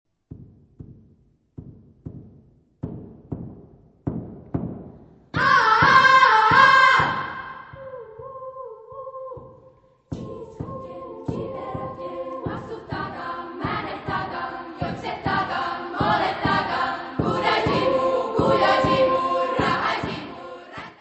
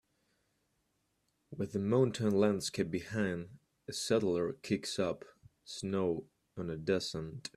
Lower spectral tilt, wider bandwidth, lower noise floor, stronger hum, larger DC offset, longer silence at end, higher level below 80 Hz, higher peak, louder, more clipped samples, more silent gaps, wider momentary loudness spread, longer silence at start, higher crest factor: about the same, -5 dB/octave vs -5.5 dB/octave; second, 8.4 kHz vs 13.5 kHz; second, -59 dBFS vs -79 dBFS; neither; neither; about the same, 0.1 s vs 0.1 s; first, -50 dBFS vs -68 dBFS; first, -2 dBFS vs -16 dBFS; first, -21 LUFS vs -35 LUFS; neither; neither; first, 24 LU vs 14 LU; second, 0.3 s vs 1.5 s; about the same, 22 dB vs 20 dB